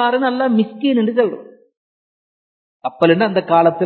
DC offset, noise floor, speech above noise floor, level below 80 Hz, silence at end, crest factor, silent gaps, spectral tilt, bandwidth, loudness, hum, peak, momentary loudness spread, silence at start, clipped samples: under 0.1%; under -90 dBFS; over 75 dB; -68 dBFS; 0 s; 18 dB; 1.77-2.80 s; -9 dB/octave; 4.5 kHz; -16 LUFS; none; 0 dBFS; 12 LU; 0 s; under 0.1%